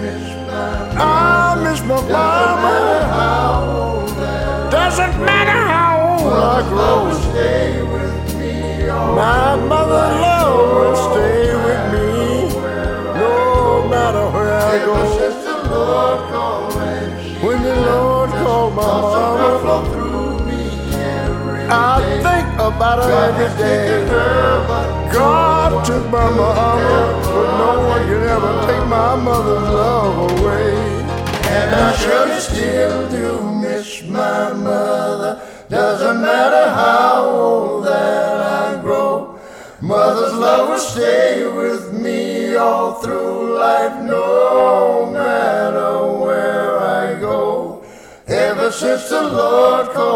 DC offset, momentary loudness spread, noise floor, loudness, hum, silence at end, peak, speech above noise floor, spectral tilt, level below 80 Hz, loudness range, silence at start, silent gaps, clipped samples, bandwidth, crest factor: under 0.1%; 8 LU; -38 dBFS; -15 LUFS; none; 0 s; 0 dBFS; 24 dB; -5.5 dB/octave; -28 dBFS; 3 LU; 0 s; none; under 0.1%; 16.5 kHz; 14 dB